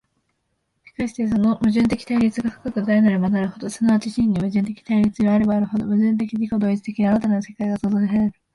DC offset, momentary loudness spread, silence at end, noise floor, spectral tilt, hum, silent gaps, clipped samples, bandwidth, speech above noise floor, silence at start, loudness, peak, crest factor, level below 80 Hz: under 0.1%; 7 LU; 0.25 s; -72 dBFS; -7.5 dB/octave; none; none; under 0.1%; 11.5 kHz; 53 dB; 1 s; -20 LUFS; -6 dBFS; 14 dB; -50 dBFS